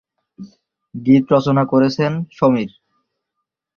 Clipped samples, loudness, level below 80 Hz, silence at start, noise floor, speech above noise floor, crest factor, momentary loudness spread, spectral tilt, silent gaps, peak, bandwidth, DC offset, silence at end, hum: under 0.1%; -16 LUFS; -56 dBFS; 0.4 s; -79 dBFS; 63 dB; 16 dB; 11 LU; -8 dB/octave; none; -2 dBFS; 6.8 kHz; under 0.1%; 1.1 s; none